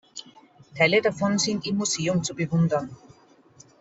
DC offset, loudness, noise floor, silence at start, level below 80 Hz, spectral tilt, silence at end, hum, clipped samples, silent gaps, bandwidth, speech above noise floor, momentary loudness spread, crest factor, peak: under 0.1%; -24 LUFS; -55 dBFS; 0.15 s; -62 dBFS; -4.5 dB/octave; 0.85 s; none; under 0.1%; none; 8.2 kHz; 31 dB; 20 LU; 20 dB; -6 dBFS